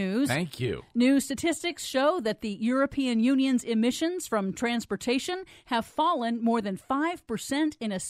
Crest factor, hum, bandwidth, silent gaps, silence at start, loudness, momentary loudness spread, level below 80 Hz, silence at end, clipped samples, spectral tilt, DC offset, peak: 16 dB; none; 15.5 kHz; none; 0 s; -28 LUFS; 7 LU; -60 dBFS; 0 s; under 0.1%; -4.5 dB/octave; under 0.1%; -12 dBFS